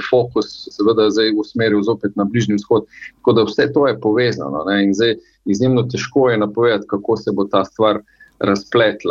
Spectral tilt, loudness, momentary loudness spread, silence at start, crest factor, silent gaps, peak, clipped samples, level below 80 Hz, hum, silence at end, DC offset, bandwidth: -6 dB/octave; -17 LUFS; 6 LU; 0 s; 14 dB; none; -2 dBFS; under 0.1%; -56 dBFS; none; 0 s; under 0.1%; 7.4 kHz